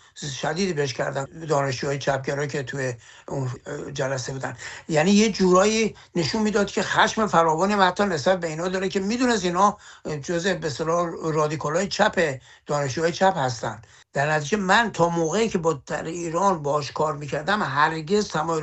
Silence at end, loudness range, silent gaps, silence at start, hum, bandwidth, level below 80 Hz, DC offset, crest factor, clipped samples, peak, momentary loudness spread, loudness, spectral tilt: 0 s; 6 LU; none; 0.15 s; none; 8.6 kHz; -54 dBFS; under 0.1%; 20 dB; under 0.1%; -4 dBFS; 12 LU; -23 LUFS; -4.5 dB/octave